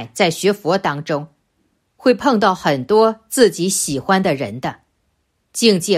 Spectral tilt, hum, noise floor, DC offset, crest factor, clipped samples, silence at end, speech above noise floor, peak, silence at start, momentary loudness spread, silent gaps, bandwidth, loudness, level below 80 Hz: -4 dB/octave; none; -67 dBFS; under 0.1%; 16 dB; under 0.1%; 0 s; 50 dB; 0 dBFS; 0 s; 10 LU; none; 15.5 kHz; -17 LUFS; -56 dBFS